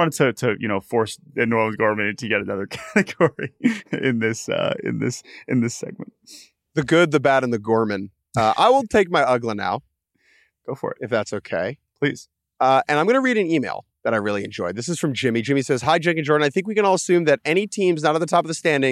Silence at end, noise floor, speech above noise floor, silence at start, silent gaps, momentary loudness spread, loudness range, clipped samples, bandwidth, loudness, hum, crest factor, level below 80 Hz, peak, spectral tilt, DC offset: 0 s; -62 dBFS; 41 dB; 0 s; none; 10 LU; 5 LU; under 0.1%; 14.5 kHz; -21 LUFS; none; 16 dB; -60 dBFS; -4 dBFS; -5 dB/octave; under 0.1%